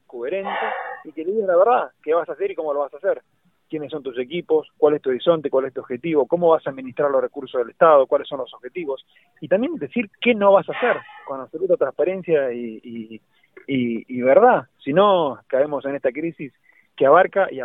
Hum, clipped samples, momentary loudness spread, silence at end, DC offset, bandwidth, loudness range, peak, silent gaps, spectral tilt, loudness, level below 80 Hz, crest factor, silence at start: none; under 0.1%; 16 LU; 0 s; under 0.1%; 4 kHz; 4 LU; 0 dBFS; none; -9 dB/octave; -20 LUFS; -68 dBFS; 20 dB; 0.15 s